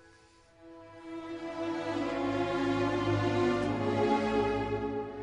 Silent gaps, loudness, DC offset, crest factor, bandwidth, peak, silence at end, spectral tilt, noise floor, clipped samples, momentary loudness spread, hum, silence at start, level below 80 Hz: none; -31 LUFS; under 0.1%; 16 dB; 10.5 kHz; -16 dBFS; 0 s; -6.5 dB/octave; -60 dBFS; under 0.1%; 13 LU; none; 0.6 s; -54 dBFS